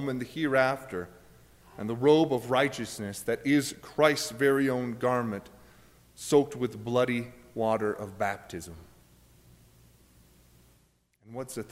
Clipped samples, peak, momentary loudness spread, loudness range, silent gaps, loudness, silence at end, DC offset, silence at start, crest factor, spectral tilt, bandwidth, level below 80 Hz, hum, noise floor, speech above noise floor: under 0.1%; -10 dBFS; 15 LU; 12 LU; none; -28 LUFS; 0.05 s; under 0.1%; 0 s; 20 dB; -5 dB/octave; 16 kHz; -62 dBFS; none; -67 dBFS; 38 dB